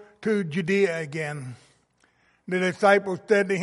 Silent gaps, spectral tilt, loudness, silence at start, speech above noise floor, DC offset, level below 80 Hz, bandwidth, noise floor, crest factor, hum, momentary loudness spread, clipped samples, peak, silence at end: none; -6 dB/octave; -24 LUFS; 0 s; 41 dB; under 0.1%; -72 dBFS; 11.5 kHz; -65 dBFS; 20 dB; none; 12 LU; under 0.1%; -4 dBFS; 0 s